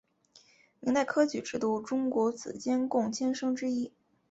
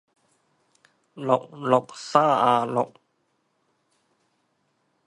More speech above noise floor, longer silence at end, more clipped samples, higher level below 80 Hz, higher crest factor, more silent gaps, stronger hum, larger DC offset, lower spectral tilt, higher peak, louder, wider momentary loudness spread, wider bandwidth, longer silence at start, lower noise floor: second, 33 dB vs 49 dB; second, 0.4 s vs 2.2 s; neither; about the same, -72 dBFS vs -76 dBFS; second, 18 dB vs 24 dB; neither; neither; neither; about the same, -4.5 dB/octave vs -5.5 dB/octave; second, -14 dBFS vs -2 dBFS; second, -31 LUFS vs -23 LUFS; about the same, 7 LU vs 9 LU; second, 8 kHz vs 11.5 kHz; second, 0.8 s vs 1.15 s; second, -63 dBFS vs -72 dBFS